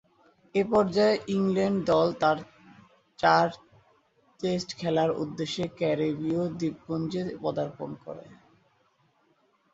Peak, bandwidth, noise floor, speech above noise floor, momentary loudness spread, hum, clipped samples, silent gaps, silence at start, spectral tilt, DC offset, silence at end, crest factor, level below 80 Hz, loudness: -6 dBFS; 8 kHz; -68 dBFS; 41 dB; 10 LU; none; under 0.1%; none; 0.55 s; -6 dB/octave; under 0.1%; 1.45 s; 22 dB; -64 dBFS; -27 LUFS